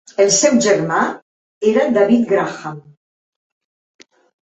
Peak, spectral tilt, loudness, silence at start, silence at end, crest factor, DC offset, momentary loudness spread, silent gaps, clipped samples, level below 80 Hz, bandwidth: -2 dBFS; -3.5 dB/octave; -15 LUFS; 0.2 s; 1.7 s; 16 dB; under 0.1%; 15 LU; 1.22-1.61 s; under 0.1%; -60 dBFS; 8.2 kHz